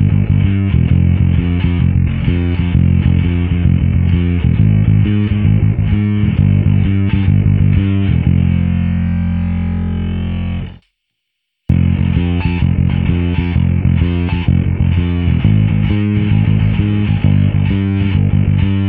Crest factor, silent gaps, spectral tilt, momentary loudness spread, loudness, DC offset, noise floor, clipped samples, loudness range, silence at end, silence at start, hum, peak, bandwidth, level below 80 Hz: 12 dB; none; -12 dB/octave; 4 LU; -14 LUFS; under 0.1%; -73 dBFS; under 0.1%; 4 LU; 0 s; 0 s; none; 0 dBFS; 3.8 kHz; -22 dBFS